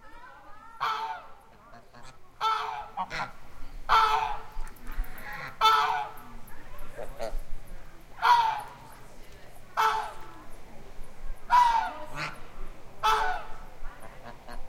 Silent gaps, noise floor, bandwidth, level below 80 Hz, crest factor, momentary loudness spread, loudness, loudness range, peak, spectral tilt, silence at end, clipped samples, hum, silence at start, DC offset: none; -51 dBFS; 16.5 kHz; -40 dBFS; 22 dB; 27 LU; -28 LUFS; 5 LU; -8 dBFS; -2 dB/octave; 0 s; under 0.1%; none; 0 s; under 0.1%